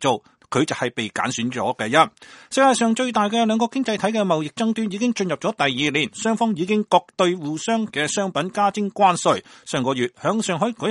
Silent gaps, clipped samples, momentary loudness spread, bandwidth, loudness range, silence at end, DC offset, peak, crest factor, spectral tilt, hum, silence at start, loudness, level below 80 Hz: none; under 0.1%; 6 LU; 11.5 kHz; 2 LU; 0 s; under 0.1%; 0 dBFS; 20 dB; -4 dB/octave; none; 0 s; -21 LUFS; -64 dBFS